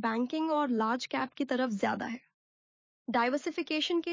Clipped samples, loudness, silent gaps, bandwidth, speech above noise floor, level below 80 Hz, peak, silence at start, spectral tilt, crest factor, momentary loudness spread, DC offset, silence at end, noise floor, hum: under 0.1%; -32 LUFS; 2.34-3.05 s; 7.6 kHz; over 59 dB; -78 dBFS; -16 dBFS; 0 s; -4.5 dB/octave; 16 dB; 7 LU; under 0.1%; 0 s; under -90 dBFS; none